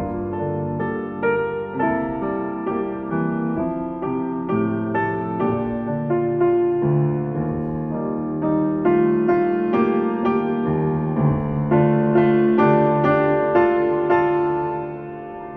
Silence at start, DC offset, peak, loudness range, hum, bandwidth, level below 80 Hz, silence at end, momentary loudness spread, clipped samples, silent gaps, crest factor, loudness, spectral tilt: 0 s; under 0.1%; -4 dBFS; 6 LU; none; 4.3 kHz; -48 dBFS; 0 s; 8 LU; under 0.1%; none; 16 dB; -21 LUFS; -11 dB/octave